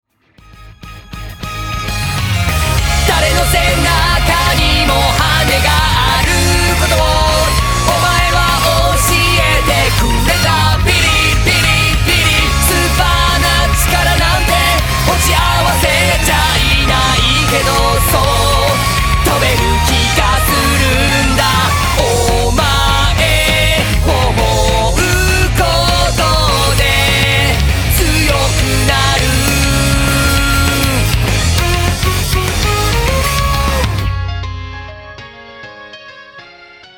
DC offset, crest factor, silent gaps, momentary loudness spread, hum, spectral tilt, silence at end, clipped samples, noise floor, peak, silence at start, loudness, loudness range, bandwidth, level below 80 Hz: under 0.1%; 12 dB; none; 5 LU; none; -3.5 dB/octave; 0.35 s; under 0.1%; -44 dBFS; 0 dBFS; 0.6 s; -11 LUFS; 4 LU; 19.5 kHz; -18 dBFS